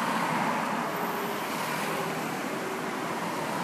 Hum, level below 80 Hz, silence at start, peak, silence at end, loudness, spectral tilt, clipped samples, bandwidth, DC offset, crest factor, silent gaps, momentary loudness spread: none; -74 dBFS; 0 s; -16 dBFS; 0 s; -30 LUFS; -4 dB/octave; under 0.1%; 15.5 kHz; under 0.1%; 14 dB; none; 4 LU